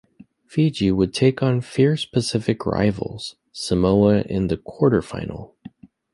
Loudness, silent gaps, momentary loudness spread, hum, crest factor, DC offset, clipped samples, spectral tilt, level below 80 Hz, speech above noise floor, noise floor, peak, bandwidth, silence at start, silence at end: -21 LUFS; none; 13 LU; none; 18 dB; under 0.1%; under 0.1%; -6.5 dB/octave; -44 dBFS; 30 dB; -50 dBFS; -4 dBFS; 11.5 kHz; 0.5 s; 0.65 s